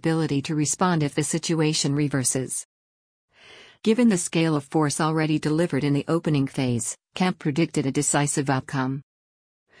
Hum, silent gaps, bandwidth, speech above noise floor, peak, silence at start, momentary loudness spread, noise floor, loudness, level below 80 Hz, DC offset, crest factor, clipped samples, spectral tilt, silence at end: none; 2.65-3.28 s; 10.5 kHz; 27 dB; -8 dBFS; 0 s; 6 LU; -50 dBFS; -23 LUFS; -60 dBFS; under 0.1%; 16 dB; under 0.1%; -5 dB/octave; 0.8 s